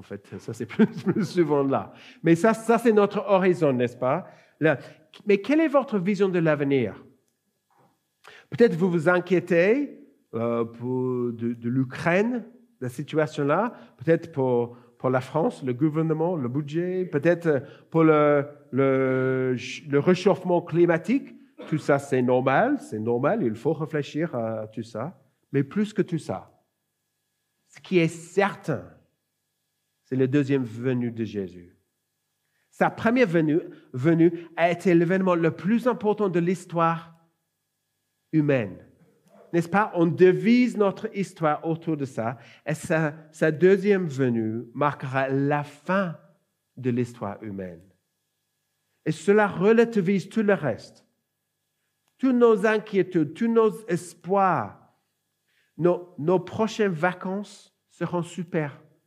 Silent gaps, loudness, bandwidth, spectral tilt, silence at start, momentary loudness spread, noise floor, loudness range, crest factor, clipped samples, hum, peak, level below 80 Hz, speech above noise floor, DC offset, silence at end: none; -24 LUFS; 13 kHz; -7.5 dB/octave; 0.1 s; 12 LU; -78 dBFS; 6 LU; 20 dB; under 0.1%; 50 Hz at -60 dBFS; -6 dBFS; -78 dBFS; 55 dB; under 0.1%; 0.3 s